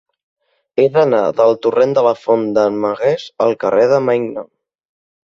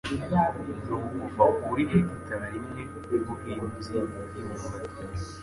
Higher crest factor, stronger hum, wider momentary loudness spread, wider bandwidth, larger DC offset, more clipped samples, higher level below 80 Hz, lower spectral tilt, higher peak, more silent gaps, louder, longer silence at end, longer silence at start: second, 14 dB vs 22 dB; neither; second, 5 LU vs 13 LU; second, 7.4 kHz vs 11.5 kHz; neither; neither; second, -60 dBFS vs -46 dBFS; about the same, -7 dB/octave vs -7.5 dB/octave; first, -2 dBFS vs -8 dBFS; neither; first, -15 LUFS vs -30 LUFS; first, 0.85 s vs 0 s; first, 0.75 s vs 0.05 s